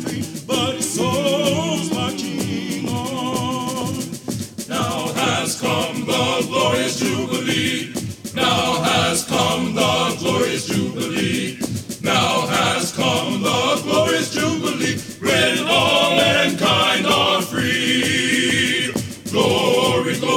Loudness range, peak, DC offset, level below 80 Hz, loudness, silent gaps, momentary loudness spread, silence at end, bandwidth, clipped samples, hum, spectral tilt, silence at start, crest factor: 6 LU; -2 dBFS; under 0.1%; -52 dBFS; -19 LUFS; none; 9 LU; 0 s; 17.5 kHz; under 0.1%; none; -3.5 dB/octave; 0 s; 18 dB